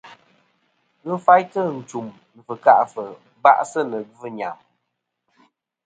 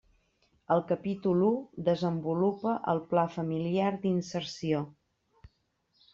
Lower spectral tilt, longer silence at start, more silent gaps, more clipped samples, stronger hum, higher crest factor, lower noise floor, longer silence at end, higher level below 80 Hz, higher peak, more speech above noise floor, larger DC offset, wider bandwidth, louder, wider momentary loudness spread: second, -5.5 dB/octave vs -7.5 dB/octave; second, 0.05 s vs 0.7 s; neither; neither; neither; about the same, 22 dB vs 18 dB; about the same, -77 dBFS vs -74 dBFS; first, 1.3 s vs 0.65 s; second, -74 dBFS vs -68 dBFS; first, 0 dBFS vs -12 dBFS; first, 58 dB vs 45 dB; neither; first, 9.2 kHz vs 7.6 kHz; first, -19 LUFS vs -30 LUFS; first, 19 LU vs 5 LU